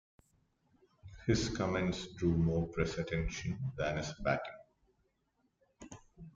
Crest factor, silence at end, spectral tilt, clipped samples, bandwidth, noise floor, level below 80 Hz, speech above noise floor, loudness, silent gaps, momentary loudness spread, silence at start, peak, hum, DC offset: 20 dB; 0.05 s; -6 dB/octave; under 0.1%; 7.6 kHz; -79 dBFS; -52 dBFS; 44 dB; -36 LUFS; none; 16 LU; 1.05 s; -18 dBFS; none; under 0.1%